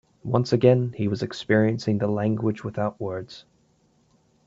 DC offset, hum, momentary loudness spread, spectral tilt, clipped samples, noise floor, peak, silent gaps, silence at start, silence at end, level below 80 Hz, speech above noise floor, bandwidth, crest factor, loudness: under 0.1%; none; 12 LU; -7.5 dB/octave; under 0.1%; -63 dBFS; -4 dBFS; none; 0.25 s; 1.05 s; -60 dBFS; 40 dB; 7.8 kHz; 20 dB; -24 LUFS